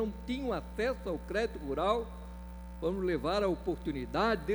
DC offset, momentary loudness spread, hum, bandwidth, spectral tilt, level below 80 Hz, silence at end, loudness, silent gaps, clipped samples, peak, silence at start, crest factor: under 0.1%; 13 LU; none; over 20 kHz; -6.5 dB/octave; -46 dBFS; 0 s; -34 LUFS; none; under 0.1%; -16 dBFS; 0 s; 18 dB